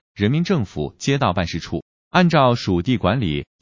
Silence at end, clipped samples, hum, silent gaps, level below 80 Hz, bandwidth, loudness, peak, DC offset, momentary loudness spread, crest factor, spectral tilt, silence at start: 0.2 s; under 0.1%; none; 1.82-2.11 s; -40 dBFS; 7.6 kHz; -20 LUFS; -2 dBFS; 0.1%; 11 LU; 18 dB; -6.5 dB/octave; 0.15 s